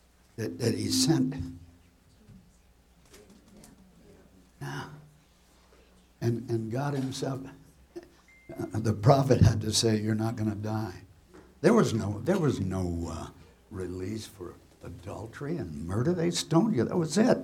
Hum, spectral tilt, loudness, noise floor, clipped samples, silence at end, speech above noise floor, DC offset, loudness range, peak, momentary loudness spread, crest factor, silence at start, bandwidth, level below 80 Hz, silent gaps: none; -5.5 dB/octave; -28 LUFS; -61 dBFS; under 0.1%; 0 s; 33 dB; under 0.1%; 20 LU; -6 dBFS; 22 LU; 24 dB; 0.4 s; 16 kHz; -52 dBFS; none